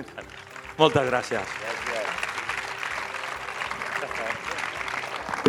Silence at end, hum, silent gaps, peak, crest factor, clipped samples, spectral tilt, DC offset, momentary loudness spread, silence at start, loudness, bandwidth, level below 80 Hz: 0 s; none; none; -2 dBFS; 26 dB; under 0.1%; -4 dB/octave; under 0.1%; 10 LU; 0 s; -28 LUFS; 18 kHz; -58 dBFS